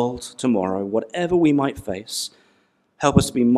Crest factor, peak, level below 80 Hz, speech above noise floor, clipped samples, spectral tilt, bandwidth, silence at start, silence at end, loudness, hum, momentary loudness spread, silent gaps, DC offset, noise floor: 20 dB; 0 dBFS; -46 dBFS; 43 dB; under 0.1%; -5.5 dB/octave; 14.5 kHz; 0 s; 0 s; -21 LUFS; none; 10 LU; none; under 0.1%; -63 dBFS